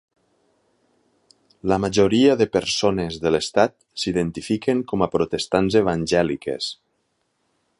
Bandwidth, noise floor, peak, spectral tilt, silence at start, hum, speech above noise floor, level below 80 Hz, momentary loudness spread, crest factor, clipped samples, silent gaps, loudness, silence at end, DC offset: 11.5 kHz; -71 dBFS; -2 dBFS; -5 dB/octave; 1.65 s; none; 50 dB; -48 dBFS; 10 LU; 20 dB; under 0.1%; none; -21 LUFS; 1.05 s; under 0.1%